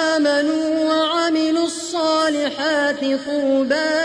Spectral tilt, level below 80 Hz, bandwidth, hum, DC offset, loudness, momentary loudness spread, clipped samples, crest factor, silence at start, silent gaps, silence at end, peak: -2.5 dB/octave; -62 dBFS; 10.5 kHz; none; under 0.1%; -19 LUFS; 3 LU; under 0.1%; 12 dB; 0 s; none; 0 s; -6 dBFS